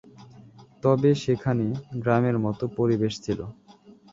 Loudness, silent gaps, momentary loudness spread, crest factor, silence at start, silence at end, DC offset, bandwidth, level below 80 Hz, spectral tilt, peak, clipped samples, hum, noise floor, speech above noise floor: -25 LUFS; none; 9 LU; 18 dB; 0.2 s; 0.6 s; under 0.1%; 7.8 kHz; -56 dBFS; -7.5 dB/octave; -6 dBFS; under 0.1%; none; -52 dBFS; 28 dB